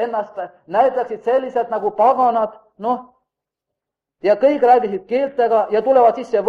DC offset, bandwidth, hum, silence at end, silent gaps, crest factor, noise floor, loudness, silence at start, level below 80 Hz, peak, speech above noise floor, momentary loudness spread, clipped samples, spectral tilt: under 0.1%; 7 kHz; none; 0 s; none; 16 dB; -82 dBFS; -17 LUFS; 0 s; -64 dBFS; -2 dBFS; 66 dB; 11 LU; under 0.1%; -6.5 dB/octave